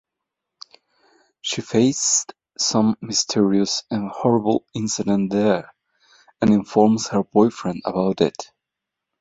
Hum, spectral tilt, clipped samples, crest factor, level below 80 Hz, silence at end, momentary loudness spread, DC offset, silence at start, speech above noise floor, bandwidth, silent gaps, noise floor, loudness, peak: none; -4.5 dB/octave; under 0.1%; 20 dB; -58 dBFS; 0.75 s; 9 LU; under 0.1%; 1.45 s; 64 dB; 8 kHz; none; -84 dBFS; -20 LUFS; -2 dBFS